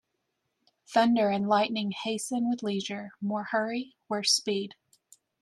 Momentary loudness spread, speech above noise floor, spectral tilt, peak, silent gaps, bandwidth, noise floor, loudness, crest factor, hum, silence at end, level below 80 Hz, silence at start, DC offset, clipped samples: 11 LU; 52 dB; -3.5 dB/octave; -12 dBFS; none; 13 kHz; -80 dBFS; -28 LUFS; 18 dB; none; 0.7 s; -78 dBFS; 0.9 s; under 0.1%; under 0.1%